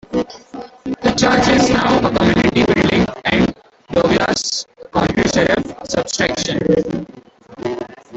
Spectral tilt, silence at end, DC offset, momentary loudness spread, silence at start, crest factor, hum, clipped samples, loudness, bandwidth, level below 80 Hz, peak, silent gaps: -4.5 dB/octave; 0 s; under 0.1%; 14 LU; 0.1 s; 16 dB; none; under 0.1%; -16 LUFS; 8.4 kHz; -38 dBFS; -2 dBFS; none